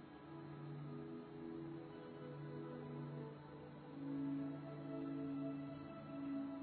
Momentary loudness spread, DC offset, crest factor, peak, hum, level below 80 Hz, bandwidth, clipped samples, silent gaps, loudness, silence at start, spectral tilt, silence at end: 8 LU; under 0.1%; 12 dB; -36 dBFS; none; -78 dBFS; 4.3 kHz; under 0.1%; none; -49 LUFS; 0 s; -8 dB/octave; 0 s